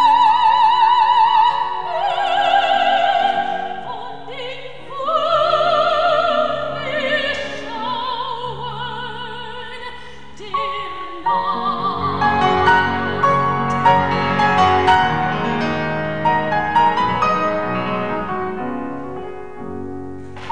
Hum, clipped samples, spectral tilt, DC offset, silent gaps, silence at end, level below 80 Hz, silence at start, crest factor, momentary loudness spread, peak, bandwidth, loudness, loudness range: none; under 0.1%; -5.5 dB/octave; 2%; none; 0 s; -48 dBFS; 0 s; 16 dB; 17 LU; -2 dBFS; 9.8 kHz; -17 LUFS; 9 LU